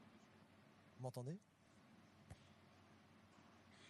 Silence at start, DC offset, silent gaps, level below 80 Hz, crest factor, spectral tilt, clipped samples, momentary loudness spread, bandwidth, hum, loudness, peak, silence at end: 0 s; under 0.1%; none; -84 dBFS; 22 dB; -6.5 dB/octave; under 0.1%; 17 LU; 12 kHz; none; -59 LUFS; -38 dBFS; 0 s